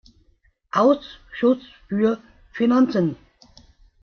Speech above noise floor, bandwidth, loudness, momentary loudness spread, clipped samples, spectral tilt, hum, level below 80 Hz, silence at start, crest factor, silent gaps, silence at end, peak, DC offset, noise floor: 41 dB; 6.6 kHz; -21 LUFS; 15 LU; under 0.1%; -7.5 dB/octave; none; -56 dBFS; 0.75 s; 18 dB; none; 0.9 s; -4 dBFS; under 0.1%; -61 dBFS